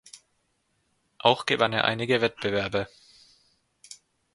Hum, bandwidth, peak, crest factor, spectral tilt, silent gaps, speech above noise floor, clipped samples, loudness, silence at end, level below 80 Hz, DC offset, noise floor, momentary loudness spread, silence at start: none; 11.5 kHz; -2 dBFS; 26 dB; -4.5 dB/octave; none; 48 dB; under 0.1%; -25 LUFS; 0.4 s; -60 dBFS; under 0.1%; -73 dBFS; 23 LU; 0.15 s